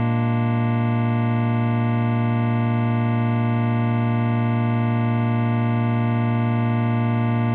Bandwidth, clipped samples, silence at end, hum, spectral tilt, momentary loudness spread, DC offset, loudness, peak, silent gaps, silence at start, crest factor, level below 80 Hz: 4 kHz; under 0.1%; 0 s; none; -8 dB/octave; 0 LU; under 0.1%; -21 LUFS; -10 dBFS; none; 0 s; 10 dB; -64 dBFS